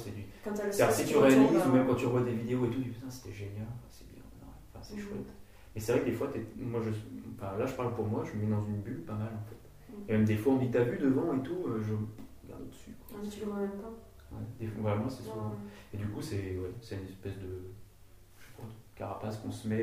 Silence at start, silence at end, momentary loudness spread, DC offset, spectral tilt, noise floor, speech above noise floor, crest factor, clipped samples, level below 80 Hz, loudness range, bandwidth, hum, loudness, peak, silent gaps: 0 s; 0 s; 21 LU; under 0.1%; -7 dB/octave; -56 dBFS; 24 dB; 22 dB; under 0.1%; -58 dBFS; 13 LU; 15.5 kHz; none; -32 LUFS; -12 dBFS; none